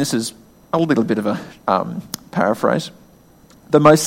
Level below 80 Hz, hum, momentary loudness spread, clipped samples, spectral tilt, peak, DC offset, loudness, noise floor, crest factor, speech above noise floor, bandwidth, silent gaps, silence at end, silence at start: -56 dBFS; none; 11 LU; under 0.1%; -5.5 dB/octave; 0 dBFS; under 0.1%; -19 LUFS; -48 dBFS; 18 dB; 31 dB; 16.5 kHz; none; 0 s; 0 s